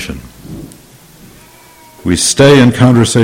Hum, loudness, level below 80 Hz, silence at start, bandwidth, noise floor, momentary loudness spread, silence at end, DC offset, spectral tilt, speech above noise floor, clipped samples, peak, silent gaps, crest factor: none; -8 LUFS; -36 dBFS; 0 s; 16.5 kHz; -40 dBFS; 24 LU; 0 s; under 0.1%; -5 dB/octave; 33 dB; 0.5%; 0 dBFS; none; 12 dB